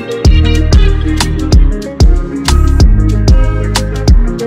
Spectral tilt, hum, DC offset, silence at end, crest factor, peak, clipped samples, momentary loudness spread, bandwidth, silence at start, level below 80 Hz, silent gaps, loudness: -6 dB/octave; none; under 0.1%; 0 s; 8 dB; 0 dBFS; 0.2%; 4 LU; 14.5 kHz; 0 s; -8 dBFS; none; -11 LUFS